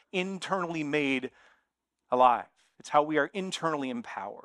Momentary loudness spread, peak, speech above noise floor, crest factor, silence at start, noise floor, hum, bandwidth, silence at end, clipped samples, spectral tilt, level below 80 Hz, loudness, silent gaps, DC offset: 12 LU; -8 dBFS; 52 dB; 22 dB; 0.15 s; -81 dBFS; none; 11.5 kHz; 0.05 s; under 0.1%; -5 dB/octave; -76 dBFS; -29 LUFS; none; under 0.1%